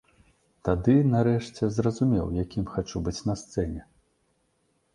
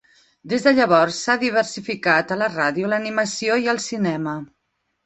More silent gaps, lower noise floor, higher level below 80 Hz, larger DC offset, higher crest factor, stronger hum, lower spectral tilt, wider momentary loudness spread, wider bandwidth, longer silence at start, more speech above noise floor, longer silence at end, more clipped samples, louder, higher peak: neither; about the same, -71 dBFS vs -73 dBFS; first, -44 dBFS vs -64 dBFS; neither; about the same, 18 dB vs 18 dB; neither; first, -7.5 dB/octave vs -4 dB/octave; about the same, 10 LU vs 9 LU; first, 11 kHz vs 8.4 kHz; first, 0.65 s vs 0.45 s; second, 46 dB vs 53 dB; first, 1.15 s vs 0.6 s; neither; second, -26 LUFS vs -20 LUFS; second, -8 dBFS vs -2 dBFS